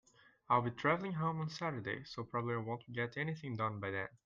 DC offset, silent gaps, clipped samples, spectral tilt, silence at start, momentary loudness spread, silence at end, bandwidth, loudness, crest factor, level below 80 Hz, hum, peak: under 0.1%; none; under 0.1%; -7 dB/octave; 0.5 s; 8 LU; 0.1 s; 7.4 kHz; -38 LUFS; 20 dB; -72 dBFS; none; -18 dBFS